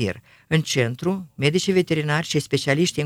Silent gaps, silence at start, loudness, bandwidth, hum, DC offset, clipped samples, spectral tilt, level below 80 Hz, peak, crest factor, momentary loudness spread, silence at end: none; 0 s; -22 LUFS; 16 kHz; none; under 0.1%; under 0.1%; -5 dB/octave; -58 dBFS; -4 dBFS; 18 dB; 6 LU; 0 s